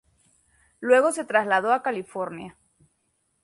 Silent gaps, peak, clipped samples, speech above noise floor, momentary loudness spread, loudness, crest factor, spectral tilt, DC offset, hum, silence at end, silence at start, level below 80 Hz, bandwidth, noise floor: none; -6 dBFS; under 0.1%; 49 dB; 15 LU; -23 LUFS; 20 dB; -4 dB/octave; under 0.1%; none; 0.95 s; 0.8 s; -70 dBFS; 11.5 kHz; -72 dBFS